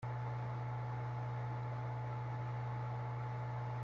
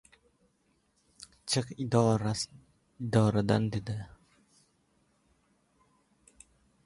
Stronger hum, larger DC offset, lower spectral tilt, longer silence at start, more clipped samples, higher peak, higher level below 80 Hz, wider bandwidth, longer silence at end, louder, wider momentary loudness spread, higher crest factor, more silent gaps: neither; neither; first, -8.5 dB/octave vs -6 dB/octave; second, 0 s vs 1.45 s; neither; second, -32 dBFS vs -10 dBFS; about the same, -64 dBFS vs -60 dBFS; second, 6.4 kHz vs 11.5 kHz; second, 0 s vs 2.8 s; second, -42 LUFS vs -30 LUFS; second, 0 LU vs 19 LU; second, 10 dB vs 22 dB; neither